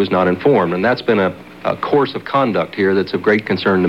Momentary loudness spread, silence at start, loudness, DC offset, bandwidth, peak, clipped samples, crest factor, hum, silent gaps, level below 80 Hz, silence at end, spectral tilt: 5 LU; 0 s; -16 LUFS; 0.2%; 7.6 kHz; -2 dBFS; under 0.1%; 14 dB; none; none; -56 dBFS; 0 s; -7.5 dB/octave